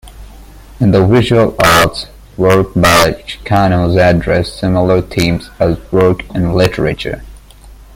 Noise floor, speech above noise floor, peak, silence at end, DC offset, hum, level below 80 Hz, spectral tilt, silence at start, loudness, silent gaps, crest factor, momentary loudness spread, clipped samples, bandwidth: -36 dBFS; 25 dB; 0 dBFS; 0.2 s; under 0.1%; none; -30 dBFS; -5.5 dB/octave; 0.05 s; -11 LUFS; none; 12 dB; 8 LU; under 0.1%; 17 kHz